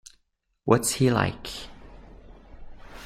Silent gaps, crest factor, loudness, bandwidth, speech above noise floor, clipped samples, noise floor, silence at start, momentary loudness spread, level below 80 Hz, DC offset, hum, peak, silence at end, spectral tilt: none; 24 dB; -25 LUFS; 16 kHz; 49 dB; under 0.1%; -72 dBFS; 0.65 s; 17 LU; -48 dBFS; under 0.1%; none; -4 dBFS; 0 s; -5 dB/octave